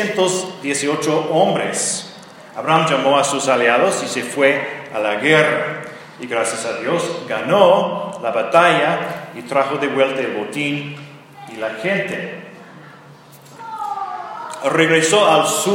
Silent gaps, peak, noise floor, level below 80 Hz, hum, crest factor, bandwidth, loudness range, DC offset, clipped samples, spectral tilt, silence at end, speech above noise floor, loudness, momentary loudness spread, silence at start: none; 0 dBFS; -42 dBFS; -70 dBFS; none; 18 dB; 17 kHz; 9 LU; under 0.1%; under 0.1%; -3.5 dB/octave; 0 s; 25 dB; -17 LUFS; 16 LU; 0 s